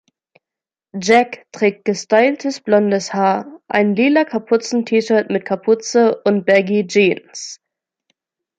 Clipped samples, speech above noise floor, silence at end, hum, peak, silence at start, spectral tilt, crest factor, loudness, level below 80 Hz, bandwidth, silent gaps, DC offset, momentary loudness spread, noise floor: under 0.1%; 72 dB; 1.05 s; none; -2 dBFS; 0.95 s; -5 dB/octave; 16 dB; -16 LUFS; -66 dBFS; 9.2 kHz; none; under 0.1%; 9 LU; -88 dBFS